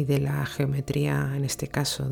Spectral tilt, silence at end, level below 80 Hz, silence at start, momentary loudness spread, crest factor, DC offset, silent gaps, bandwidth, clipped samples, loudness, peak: -5.5 dB/octave; 0 s; -48 dBFS; 0 s; 3 LU; 14 dB; under 0.1%; none; 17.5 kHz; under 0.1%; -27 LUFS; -12 dBFS